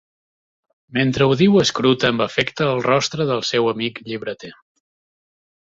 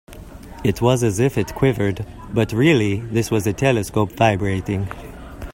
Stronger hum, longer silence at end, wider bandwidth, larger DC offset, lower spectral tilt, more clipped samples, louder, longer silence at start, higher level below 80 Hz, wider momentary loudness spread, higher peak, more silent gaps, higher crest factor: neither; first, 1.15 s vs 0 s; second, 8 kHz vs 16.5 kHz; neither; about the same, -5 dB/octave vs -6 dB/octave; neither; about the same, -18 LUFS vs -19 LUFS; first, 0.9 s vs 0.1 s; second, -54 dBFS vs -40 dBFS; about the same, 13 LU vs 14 LU; about the same, -2 dBFS vs 0 dBFS; neither; about the same, 18 dB vs 20 dB